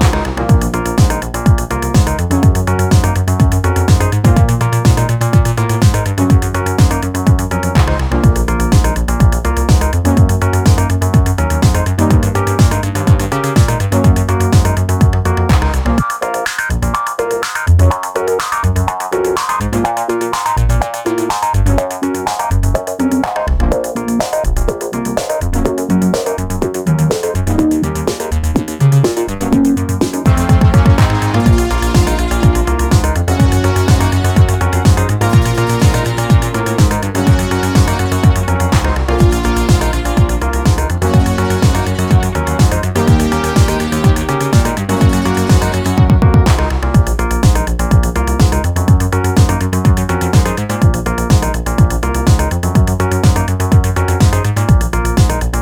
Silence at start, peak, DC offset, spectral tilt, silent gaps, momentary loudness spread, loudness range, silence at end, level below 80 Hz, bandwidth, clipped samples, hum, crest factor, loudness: 0 s; 0 dBFS; under 0.1%; -6 dB/octave; none; 5 LU; 3 LU; 0 s; -18 dBFS; 19.5 kHz; under 0.1%; none; 12 dB; -13 LUFS